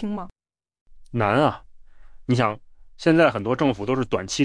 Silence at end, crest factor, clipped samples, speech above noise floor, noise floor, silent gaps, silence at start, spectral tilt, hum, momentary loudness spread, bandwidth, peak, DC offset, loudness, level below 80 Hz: 0 s; 18 dB; under 0.1%; 22 dB; -43 dBFS; 0.81-0.86 s; 0 s; -6 dB/octave; none; 19 LU; 10.5 kHz; -6 dBFS; under 0.1%; -22 LUFS; -50 dBFS